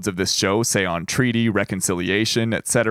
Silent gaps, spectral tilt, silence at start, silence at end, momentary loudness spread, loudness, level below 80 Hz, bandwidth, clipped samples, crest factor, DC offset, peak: none; -3.5 dB/octave; 0 s; 0 s; 3 LU; -20 LUFS; -52 dBFS; 16.5 kHz; under 0.1%; 16 dB; under 0.1%; -4 dBFS